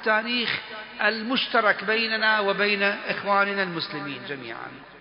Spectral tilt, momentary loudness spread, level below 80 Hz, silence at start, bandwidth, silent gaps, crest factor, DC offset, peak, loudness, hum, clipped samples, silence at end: -8 dB/octave; 13 LU; -68 dBFS; 0 s; 5.4 kHz; none; 18 dB; under 0.1%; -6 dBFS; -23 LUFS; none; under 0.1%; 0 s